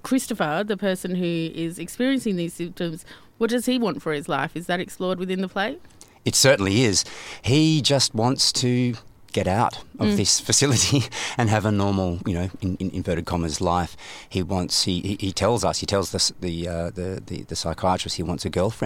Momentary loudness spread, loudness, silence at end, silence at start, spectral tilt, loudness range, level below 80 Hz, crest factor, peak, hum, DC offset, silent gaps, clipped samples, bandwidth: 11 LU; -23 LUFS; 0 s; 0.05 s; -4 dB/octave; 6 LU; -48 dBFS; 20 dB; -4 dBFS; none; under 0.1%; none; under 0.1%; 16.5 kHz